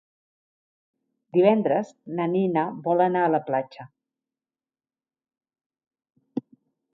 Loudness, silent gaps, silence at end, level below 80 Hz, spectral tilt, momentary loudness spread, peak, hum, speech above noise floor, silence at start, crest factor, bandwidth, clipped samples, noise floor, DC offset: -23 LUFS; 5.66-5.70 s; 0.55 s; -78 dBFS; -8.5 dB/octave; 16 LU; -6 dBFS; none; over 67 dB; 1.35 s; 20 dB; 7.2 kHz; under 0.1%; under -90 dBFS; under 0.1%